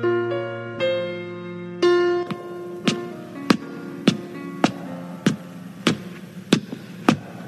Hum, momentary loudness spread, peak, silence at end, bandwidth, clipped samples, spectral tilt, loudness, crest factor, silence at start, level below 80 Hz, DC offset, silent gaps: none; 13 LU; 0 dBFS; 0 s; 13.5 kHz; under 0.1%; -5.5 dB/octave; -24 LUFS; 24 dB; 0 s; -66 dBFS; under 0.1%; none